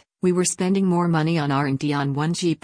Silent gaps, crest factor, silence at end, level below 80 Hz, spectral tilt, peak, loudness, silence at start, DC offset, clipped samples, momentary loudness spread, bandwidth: none; 12 dB; 0.1 s; -60 dBFS; -5.5 dB/octave; -8 dBFS; -21 LUFS; 0.25 s; under 0.1%; under 0.1%; 3 LU; 10.5 kHz